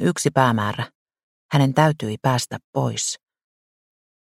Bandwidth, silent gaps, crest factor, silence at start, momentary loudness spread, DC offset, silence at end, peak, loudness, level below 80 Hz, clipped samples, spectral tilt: 15.5 kHz; 0.95-1.06 s, 1.23-1.49 s, 2.64-2.73 s; 22 dB; 0 s; 10 LU; under 0.1%; 1.1 s; 0 dBFS; -21 LUFS; -58 dBFS; under 0.1%; -5 dB/octave